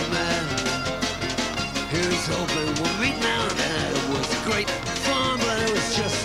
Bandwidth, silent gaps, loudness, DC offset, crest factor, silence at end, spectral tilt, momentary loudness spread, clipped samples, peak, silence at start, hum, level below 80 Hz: 16 kHz; none; -24 LUFS; under 0.1%; 14 dB; 0 s; -3.5 dB/octave; 3 LU; under 0.1%; -10 dBFS; 0 s; none; -44 dBFS